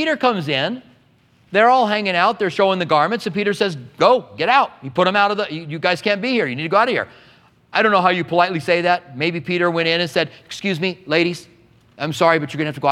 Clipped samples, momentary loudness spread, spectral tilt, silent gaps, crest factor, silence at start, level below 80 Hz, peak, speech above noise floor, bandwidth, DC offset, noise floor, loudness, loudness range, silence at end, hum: under 0.1%; 8 LU; -5.5 dB/octave; none; 18 dB; 0 s; -64 dBFS; 0 dBFS; 37 dB; 14.5 kHz; under 0.1%; -55 dBFS; -18 LUFS; 3 LU; 0 s; none